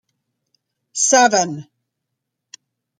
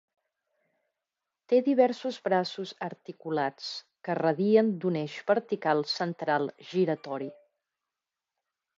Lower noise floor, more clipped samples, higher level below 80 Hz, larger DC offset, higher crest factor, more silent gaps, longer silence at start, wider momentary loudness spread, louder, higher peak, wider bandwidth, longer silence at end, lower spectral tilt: second, -79 dBFS vs -89 dBFS; neither; first, -70 dBFS vs -82 dBFS; neither; about the same, 20 dB vs 20 dB; neither; second, 0.95 s vs 1.5 s; first, 18 LU vs 14 LU; first, -15 LUFS vs -29 LUFS; first, 0 dBFS vs -10 dBFS; first, 12 kHz vs 7.8 kHz; about the same, 1.35 s vs 1.45 s; second, -1.5 dB/octave vs -6.5 dB/octave